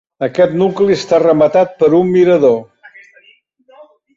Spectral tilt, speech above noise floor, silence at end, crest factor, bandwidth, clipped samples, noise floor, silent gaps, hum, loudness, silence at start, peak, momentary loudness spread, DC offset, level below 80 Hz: -7 dB/octave; 40 dB; 1.55 s; 12 dB; 7.6 kHz; under 0.1%; -51 dBFS; none; none; -12 LUFS; 0.2 s; -2 dBFS; 4 LU; under 0.1%; -54 dBFS